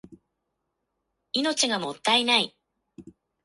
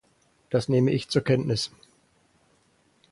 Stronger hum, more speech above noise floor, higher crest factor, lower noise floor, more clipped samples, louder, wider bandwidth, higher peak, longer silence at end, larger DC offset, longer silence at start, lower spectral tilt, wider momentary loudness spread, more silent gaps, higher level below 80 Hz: neither; first, 56 dB vs 41 dB; about the same, 22 dB vs 18 dB; first, -80 dBFS vs -65 dBFS; neither; about the same, -24 LUFS vs -25 LUFS; about the same, 11.5 kHz vs 11.5 kHz; first, -6 dBFS vs -10 dBFS; second, 0.35 s vs 1.45 s; neither; second, 0.1 s vs 0.5 s; second, -1.5 dB/octave vs -6 dB/octave; first, 9 LU vs 6 LU; neither; second, -72 dBFS vs -58 dBFS